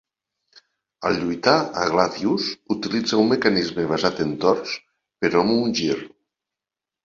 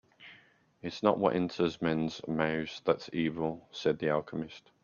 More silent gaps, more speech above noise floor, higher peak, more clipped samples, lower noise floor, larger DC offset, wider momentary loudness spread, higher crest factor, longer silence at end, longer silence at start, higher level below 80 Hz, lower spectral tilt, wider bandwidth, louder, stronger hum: neither; first, 68 dB vs 31 dB; first, -2 dBFS vs -10 dBFS; neither; first, -88 dBFS vs -62 dBFS; neither; second, 7 LU vs 13 LU; about the same, 20 dB vs 22 dB; first, 0.95 s vs 0.25 s; first, 0.55 s vs 0.2 s; first, -56 dBFS vs -66 dBFS; second, -5 dB/octave vs -6.5 dB/octave; about the same, 7.6 kHz vs 7.2 kHz; first, -21 LUFS vs -32 LUFS; neither